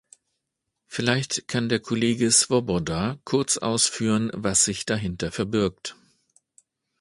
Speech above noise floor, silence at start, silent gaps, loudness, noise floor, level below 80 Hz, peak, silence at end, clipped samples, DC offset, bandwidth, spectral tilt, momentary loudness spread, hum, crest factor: 57 dB; 0.9 s; none; -23 LUFS; -81 dBFS; -52 dBFS; -4 dBFS; 1.1 s; under 0.1%; under 0.1%; 11.5 kHz; -3.5 dB/octave; 10 LU; none; 22 dB